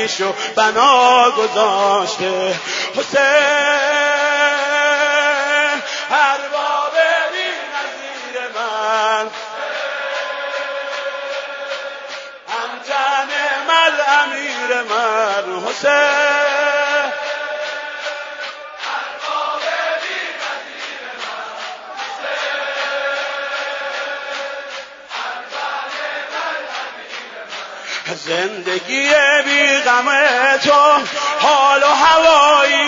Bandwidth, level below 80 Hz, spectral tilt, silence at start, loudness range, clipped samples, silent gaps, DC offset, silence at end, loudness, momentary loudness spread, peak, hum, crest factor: 7.8 kHz; -64 dBFS; -1 dB/octave; 0 s; 11 LU; under 0.1%; none; under 0.1%; 0 s; -16 LUFS; 15 LU; 0 dBFS; none; 16 dB